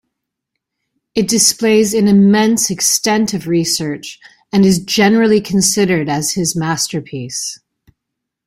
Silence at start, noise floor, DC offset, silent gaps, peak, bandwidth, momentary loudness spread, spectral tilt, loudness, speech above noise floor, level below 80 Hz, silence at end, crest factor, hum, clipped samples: 1.15 s; -78 dBFS; under 0.1%; none; 0 dBFS; 16 kHz; 12 LU; -4 dB/octave; -13 LUFS; 65 dB; -52 dBFS; 0.9 s; 14 dB; none; under 0.1%